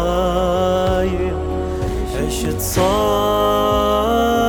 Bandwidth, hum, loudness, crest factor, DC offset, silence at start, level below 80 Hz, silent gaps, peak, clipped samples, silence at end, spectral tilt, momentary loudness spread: 19 kHz; none; -18 LUFS; 12 dB; under 0.1%; 0 s; -28 dBFS; none; -4 dBFS; under 0.1%; 0 s; -5 dB/octave; 6 LU